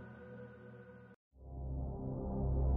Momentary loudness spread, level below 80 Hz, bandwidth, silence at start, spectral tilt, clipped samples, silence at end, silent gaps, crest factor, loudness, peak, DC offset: 20 LU; -42 dBFS; 2.4 kHz; 0 s; -11 dB/octave; under 0.1%; 0 s; 1.16-1.31 s; 16 dB; -43 LUFS; -24 dBFS; under 0.1%